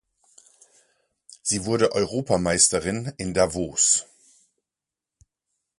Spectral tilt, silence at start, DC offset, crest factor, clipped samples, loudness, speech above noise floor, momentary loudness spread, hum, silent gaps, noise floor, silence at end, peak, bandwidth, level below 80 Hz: -3 dB/octave; 1.45 s; under 0.1%; 22 dB; under 0.1%; -22 LUFS; 66 dB; 10 LU; none; none; -89 dBFS; 1.75 s; -4 dBFS; 11.5 kHz; -50 dBFS